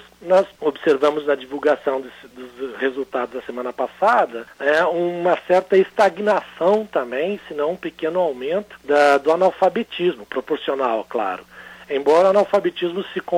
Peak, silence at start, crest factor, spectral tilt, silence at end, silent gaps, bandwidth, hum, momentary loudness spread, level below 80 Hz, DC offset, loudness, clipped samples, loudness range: -4 dBFS; 0.2 s; 16 dB; -5.5 dB/octave; 0 s; none; 15.5 kHz; none; 12 LU; -62 dBFS; under 0.1%; -20 LUFS; under 0.1%; 4 LU